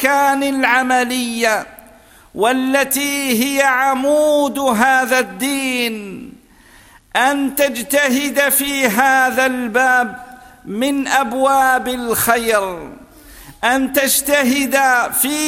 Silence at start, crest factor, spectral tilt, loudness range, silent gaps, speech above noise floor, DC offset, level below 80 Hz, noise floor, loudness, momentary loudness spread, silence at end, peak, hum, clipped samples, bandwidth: 0 s; 16 dB; -2 dB/octave; 3 LU; none; 30 dB; under 0.1%; -50 dBFS; -46 dBFS; -15 LUFS; 8 LU; 0 s; 0 dBFS; none; under 0.1%; 16.5 kHz